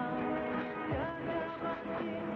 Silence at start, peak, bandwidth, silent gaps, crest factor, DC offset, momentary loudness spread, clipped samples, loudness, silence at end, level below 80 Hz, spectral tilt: 0 s; -24 dBFS; 6.4 kHz; none; 12 dB; under 0.1%; 3 LU; under 0.1%; -37 LUFS; 0 s; -60 dBFS; -8.5 dB/octave